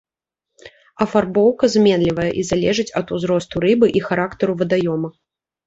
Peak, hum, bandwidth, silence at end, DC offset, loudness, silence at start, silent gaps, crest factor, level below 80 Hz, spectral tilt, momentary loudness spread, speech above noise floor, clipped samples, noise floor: -2 dBFS; none; 8 kHz; 0.55 s; under 0.1%; -18 LUFS; 0.65 s; none; 16 dB; -48 dBFS; -6 dB/octave; 8 LU; 66 dB; under 0.1%; -83 dBFS